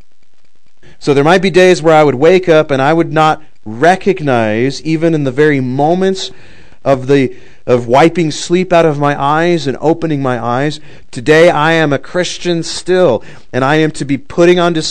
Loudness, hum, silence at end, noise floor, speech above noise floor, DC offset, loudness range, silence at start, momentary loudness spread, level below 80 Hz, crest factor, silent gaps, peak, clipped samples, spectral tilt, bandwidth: -11 LUFS; none; 0 s; -59 dBFS; 48 dB; 4%; 3 LU; 1 s; 11 LU; -44 dBFS; 12 dB; none; 0 dBFS; 1%; -5.5 dB/octave; 12 kHz